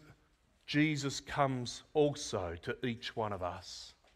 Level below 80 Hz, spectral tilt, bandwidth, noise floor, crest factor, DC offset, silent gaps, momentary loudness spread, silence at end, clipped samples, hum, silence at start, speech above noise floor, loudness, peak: -62 dBFS; -5 dB/octave; 14 kHz; -70 dBFS; 22 dB; under 0.1%; none; 12 LU; 0.25 s; under 0.1%; none; 0.05 s; 35 dB; -36 LUFS; -14 dBFS